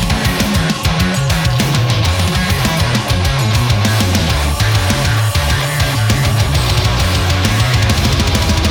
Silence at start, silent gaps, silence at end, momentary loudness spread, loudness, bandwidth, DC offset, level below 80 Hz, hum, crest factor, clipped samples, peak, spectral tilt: 0 s; none; 0 s; 2 LU; -14 LUFS; over 20 kHz; under 0.1%; -22 dBFS; none; 12 dB; under 0.1%; 0 dBFS; -4.5 dB/octave